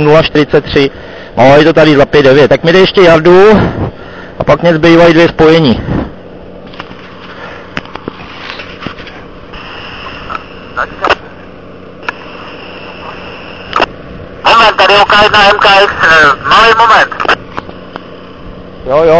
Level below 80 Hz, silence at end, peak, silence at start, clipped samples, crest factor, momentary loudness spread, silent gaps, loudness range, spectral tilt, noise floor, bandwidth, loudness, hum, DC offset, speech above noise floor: -32 dBFS; 0 s; 0 dBFS; 0 s; 3%; 8 dB; 23 LU; none; 18 LU; -5.5 dB/octave; -30 dBFS; 8 kHz; -6 LUFS; none; 1%; 24 dB